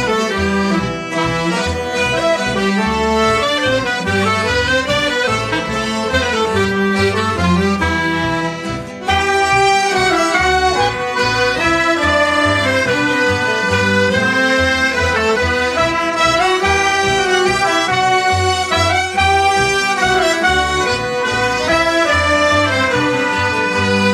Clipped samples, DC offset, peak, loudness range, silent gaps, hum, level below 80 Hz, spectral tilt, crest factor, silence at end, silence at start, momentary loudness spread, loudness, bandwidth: under 0.1%; under 0.1%; 0 dBFS; 2 LU; none; none; -34 dBFS; -4 dB/octave; 14 dB; 0 s; 0 s; 4 LU; -14 LUFS; 15.5 kHz